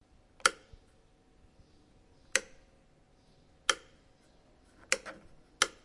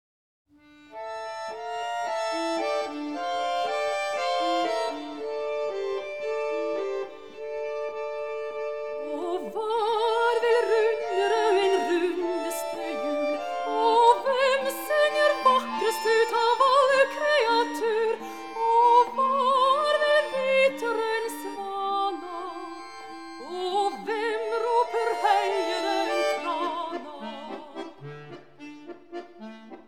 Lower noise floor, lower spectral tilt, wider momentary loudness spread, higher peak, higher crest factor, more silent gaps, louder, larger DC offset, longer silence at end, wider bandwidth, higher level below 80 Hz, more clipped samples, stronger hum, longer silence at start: first, -64 dBFS vs -51 dBFS; second, 1 dB/octave vs -2.5 dB/octave; first, 23 LU vs 17 LU; about the same, -4 dBFS vs -6 dBFS; first, 34 dB vs 20 dB; neither; second, -33 LUFS vs -25 LUFS; second, under 0.1% vs 0.3%; about the same, 0.15 s vs 0.05 s; second, 11.5 kHz vs 18 kHz; first, -66 dBFS vs -74 dBFS; neither; neither; second, 0.45 s vs 0.65 s